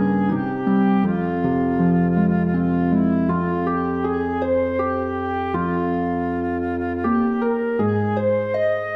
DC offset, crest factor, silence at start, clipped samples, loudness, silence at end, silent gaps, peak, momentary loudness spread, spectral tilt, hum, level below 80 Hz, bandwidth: under 0.1%; 12 dB; 0 s; under 0.1%; -21 LUFS; 0 s; none; -8 dBFS; 5 LU; -10.5 dB/octave; none; -48 dBFS; 4.7 kHz